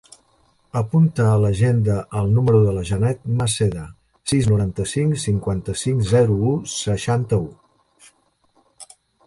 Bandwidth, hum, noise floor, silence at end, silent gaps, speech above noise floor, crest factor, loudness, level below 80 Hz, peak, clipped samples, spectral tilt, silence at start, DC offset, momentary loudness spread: 11.5 kHz; none; -61 dBFS; 0.45 s; none; 43 dB; 16 dB; -20 LUFS; -42 dBFS; -4 dBFS; under 0.1%; -6.5 dB/octave; 0.75 s; under 0.1%; 7 LU